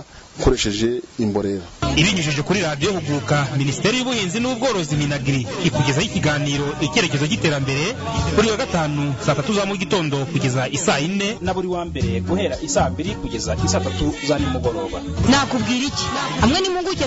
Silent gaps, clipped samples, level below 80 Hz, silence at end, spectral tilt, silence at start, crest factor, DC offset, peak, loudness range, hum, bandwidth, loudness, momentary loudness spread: none; under 0.1%; -36 dBFS; 0 s; -4.5 dB/octave; 0 s; 16 dB; under 0.1%; -4 dBFS; 2 LU; none; 8 kHz; -20 LUFS; 6 LU